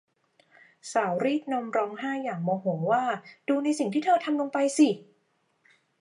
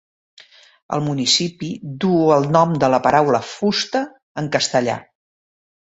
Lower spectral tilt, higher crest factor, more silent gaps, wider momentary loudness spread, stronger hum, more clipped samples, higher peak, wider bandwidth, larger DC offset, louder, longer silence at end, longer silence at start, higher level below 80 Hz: about the same, -5.5 dB/octave vs -4.5 dB/octave; about the same, 18 dB vs 18 dB; second, none vs 4.23-4.35 s; second, 8 LU vs 13 LU; neither; neither; second, -10 dBFS vs 0 dBFS; first, 11.5 kHz vs 8.2 kHz; neither; second, -27 LUFS vs -18 LUFS; first, 0.95 s vs 0.8 s; about the same, 0.85 s vs 0.9 s; second, -84 dBFS vs -58 dBFS